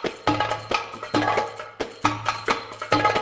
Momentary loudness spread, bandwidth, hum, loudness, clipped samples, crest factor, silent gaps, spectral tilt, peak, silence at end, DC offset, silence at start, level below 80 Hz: 6 LU; 8 kHz; none; -25 LUFS; under 0.1%; 22 dB; none; -4.5 dB/octave; -4 dBFS; 0 s; under 0.1%; 0 s; -52 dBFS